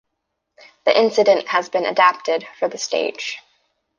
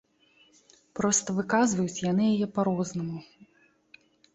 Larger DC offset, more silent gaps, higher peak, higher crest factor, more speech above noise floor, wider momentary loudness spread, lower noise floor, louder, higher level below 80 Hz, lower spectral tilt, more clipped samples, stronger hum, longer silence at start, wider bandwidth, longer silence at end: neither; neither; first, 0 dBFS vs -12 dBFS; about the same, 20 dB vs 18 dB; first, 58 dB vs 38 dB; about the same, 11 LU vs 11 LU; first, -77 dBFS vs -64 dBFS; first, -19 LUFS vs -27 LUFS; second, -72 dBFS vs -66 dBFS; second, -2.5 dB/octave vs -4.5 dB/octave; neither; neither; about the same, 0.85 s vs 0.95 s; first, 9.8 kHz vs 8.2 kHz; second, 0.6 s vs 0.9 s